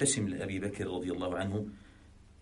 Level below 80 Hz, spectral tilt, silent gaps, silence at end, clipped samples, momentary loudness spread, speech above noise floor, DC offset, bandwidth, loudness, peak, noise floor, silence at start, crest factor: -58 dBFS; -4 dB/octave; none; 0.1 s; under 0.1%; 9 LU; 23 dB; under 0.1%; 11.5 kHz; -35 LUFS; -16 dBFS; -57 dBFS; 0 s; 20 dB